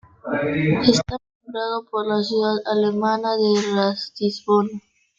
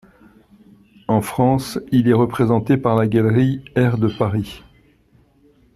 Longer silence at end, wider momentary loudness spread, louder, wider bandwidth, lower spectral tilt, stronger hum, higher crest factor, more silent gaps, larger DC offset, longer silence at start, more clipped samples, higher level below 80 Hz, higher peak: second, 0.4 s vs 1.2 s; first, 10 LU vs 6 LU; second, -21 LUFS vs -18 LUFS; second, 7.8 kHz vs 13.5 kHz; second, -5.5 dB/octave vs -8 dB/octave; neither; about the same, 20 dB vs 16 dB; first, 1.35-1.40 s vs none; neither; second, 0.25 s vs 1.1 s; neither; about the same, -52 dBFS vs -48 dBFS; about the same, -2 dBFS vs -2 dBFS